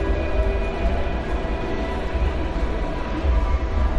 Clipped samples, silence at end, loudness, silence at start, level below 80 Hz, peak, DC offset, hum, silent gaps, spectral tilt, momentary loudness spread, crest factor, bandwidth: under 0.1%; 0 s; -25 LUFS; 0 s; -24 dBFS; -10 dBFS; under 0.1%; none; none; -7.5 dB/octave; 4 LU; 12 dB; 7.4 kHz